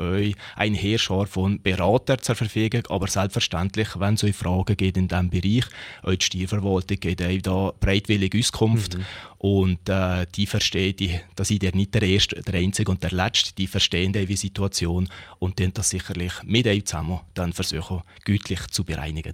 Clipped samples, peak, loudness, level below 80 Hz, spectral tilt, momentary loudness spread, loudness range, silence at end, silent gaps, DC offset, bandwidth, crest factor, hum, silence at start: under 0.1%; -4 dBFS; -23 LUFS; -42 dBFS; -4.5 dB/octave; 8 LU; 3 LU; 0 s; none; under 0.1%; 16 kHz; 18 dB; none; 0 s